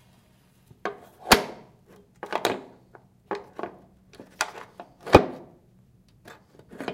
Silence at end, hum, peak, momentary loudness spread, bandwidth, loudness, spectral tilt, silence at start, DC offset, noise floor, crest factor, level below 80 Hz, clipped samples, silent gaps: 0 s; none; 0 dBFS; 25 LU; 16.5 kHz; -25 LUFS; -4 dB/octave; 0.85 s; under 0.1%; -60 dBFS; 28 dB; -46 dBFS; under 0.1%; none